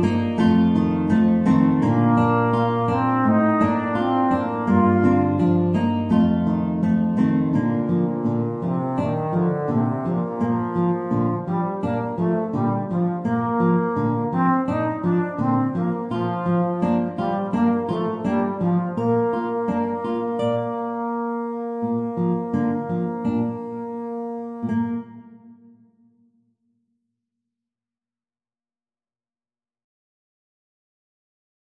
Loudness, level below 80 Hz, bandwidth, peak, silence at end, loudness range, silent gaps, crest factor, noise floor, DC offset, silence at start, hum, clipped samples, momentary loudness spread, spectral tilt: -22 LUFS; -54 dBFS; 7.4 kHz; -6 dBFS; 6.15 s; 7 LU; none; 16 dB; under -90 dBFS; under 0.1%; 0 s; none; under 0.1%; 7 LU; -9.5 dB/octave